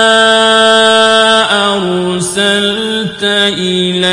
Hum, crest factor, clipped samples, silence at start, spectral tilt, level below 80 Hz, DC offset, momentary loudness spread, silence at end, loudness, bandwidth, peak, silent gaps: none; 10 dB; 0.2%; 0 s; -3 dB/octave; -48 dBFS; under 0.1%; 8 LU; 0 s; -9 LUFS; 11.5 kHz; 0 dBFS; none